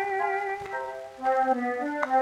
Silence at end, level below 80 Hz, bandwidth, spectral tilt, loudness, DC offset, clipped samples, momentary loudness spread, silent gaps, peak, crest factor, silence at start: 0 s; -68 dBFS; 12 kHz; -4.5 dB/octave; -28 LUFS; under 0.1%; under 0.1%; 9 LU; none; -8 dBFS; 20 dB; 0 s